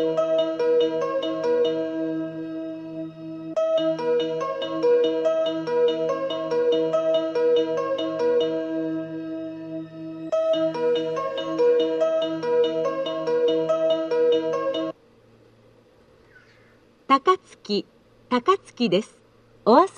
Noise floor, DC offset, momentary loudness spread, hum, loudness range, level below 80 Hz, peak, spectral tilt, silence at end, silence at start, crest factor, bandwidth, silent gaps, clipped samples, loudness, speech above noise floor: -56 dBFS; under 0.1%; 12 LU; none; 4 LU; -70 dBFS; -4 dBFS; -5.5 dB/octave; 0 s; 0 s; 20 dB; 8.8 kHz; none; under 0.1%; -23 LUFS; 32 dB